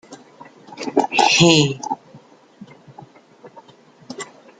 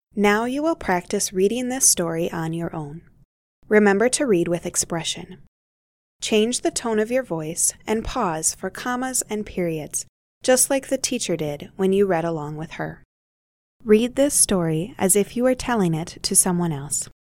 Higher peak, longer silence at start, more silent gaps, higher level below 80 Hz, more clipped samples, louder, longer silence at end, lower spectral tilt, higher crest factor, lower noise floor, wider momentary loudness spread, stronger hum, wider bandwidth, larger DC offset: about the same, 0 dBFS vs -2 dBFS; about the same, 0.1 s vs 0.15 s; second, none vs 3.25-3.62 s, 5.48-6.19 s, 10.09-10.41 s, 13.05-13.80 s; second, -60 dBFS vs -48 dBFS; neither; first, -16 LUFS vs -21 LUFS; about the same, 0.35 s vs 0.25 s; about the same, -3.5 dB/octave vs -3.5 dB/octave; about the same, 20 dB vs 20 dB; second, -49 dBFS vs under -90 dBFS; first, 22 LU vs 12 LU; neither; second, 9.6 kHz vs 17 kHz; neither